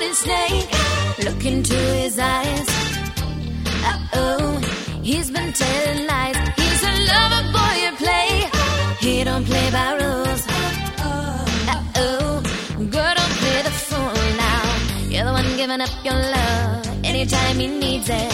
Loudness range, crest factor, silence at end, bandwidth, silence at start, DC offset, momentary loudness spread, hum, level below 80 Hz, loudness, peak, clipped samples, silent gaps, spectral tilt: 4 LU; 16 dB; 0 s; 16.5 kHz; 0 s; under 0.1%; 6 LU; none; -28 dBFS; -19 LUFS; -4 dBFS; under 0.1%; none; -4 dB/octave